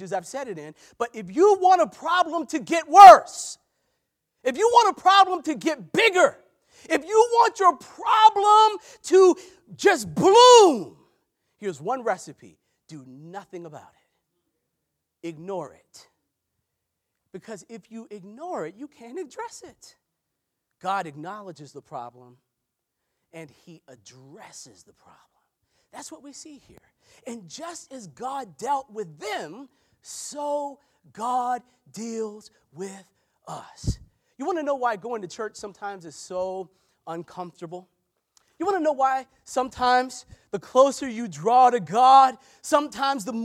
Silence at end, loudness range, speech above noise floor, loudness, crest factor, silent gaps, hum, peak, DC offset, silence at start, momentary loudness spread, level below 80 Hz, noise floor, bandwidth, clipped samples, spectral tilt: 0 s; 24 LU; 59 dB; -19 LUFS; 22 dB; none; none; 0 dBFS; under 0.1%; 0 s; 23 LU; -54 dBFS; -81 dBFS; 15.5 kHz; under 0.1%; -3.5 dB/octave